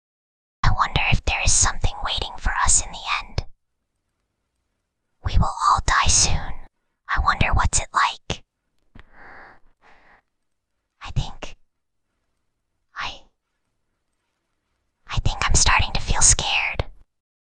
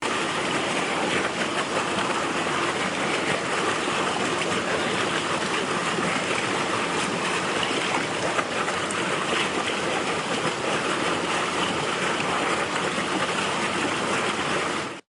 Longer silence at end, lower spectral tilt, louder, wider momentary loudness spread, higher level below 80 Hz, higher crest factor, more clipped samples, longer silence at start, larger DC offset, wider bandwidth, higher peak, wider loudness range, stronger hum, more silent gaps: first, 0.4 s vs 0.1 s; second, -1.5 dB/octave vs -3 dB/octave; first, -20 LUFS vs -24 LUFS; first, 16 LU vs 1 LU; first, -28 dBFS vs -62 dBFS; first, 22 dB vs 16 dB; neither; first, 0.65 s vs 0 s; neither; second, 10 kHz vs 11.5 kHz; first, -2 dBFS vs -10 dBFS; first, 18 LU vs 0 LU; neither; neither